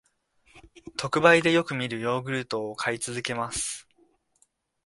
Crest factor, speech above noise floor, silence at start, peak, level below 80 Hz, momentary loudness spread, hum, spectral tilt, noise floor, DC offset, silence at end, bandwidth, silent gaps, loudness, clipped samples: 24 dB; 43 dB; 0.55 s; -4 dBFS; -62 dBFS; 13 LU; none; -4 dB/octave; -69 dBFS; under 0.1%; 1.05 s; 11.5 kHz; none; -25 LUFS; under 0.1%